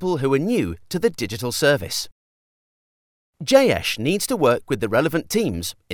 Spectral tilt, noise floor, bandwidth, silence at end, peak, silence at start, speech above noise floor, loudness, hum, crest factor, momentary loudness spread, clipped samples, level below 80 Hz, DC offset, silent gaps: -4.5 dB/octave; under -90 dBFS; over 20 kHz; 0 s; 0 dBFS; 0 s; over 69 dB; -21 LUFS; none; 20 dB; 10 LU; under 0.1%; -50 dBFS; under 0.1%; 2.12-3.33 s